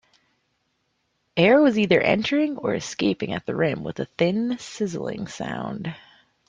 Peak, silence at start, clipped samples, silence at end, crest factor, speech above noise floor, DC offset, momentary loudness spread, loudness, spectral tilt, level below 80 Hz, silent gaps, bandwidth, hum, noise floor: -4 dBFS; 1.35 s; under 0.1%; 0.5 s; 20 dB; 50 dB; under 0.1%; 14 LU; -23 LUFS; -5.5 dB/octave; -60 dBFS; none; 9.6 kHz; none; -72 dBFS